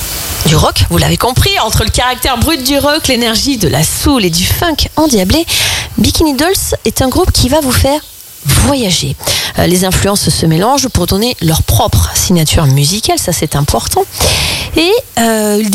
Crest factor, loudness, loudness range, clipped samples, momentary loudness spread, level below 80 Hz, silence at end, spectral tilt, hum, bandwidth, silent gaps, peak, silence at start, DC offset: 10 dB; -10 LUFS; 1 LU; under 0.1%; 3 LU; -22 dBFS; 0 s; -4 dB/octave; none; 17 kHz; none; 0 dBFS; 0 s; under 0.1%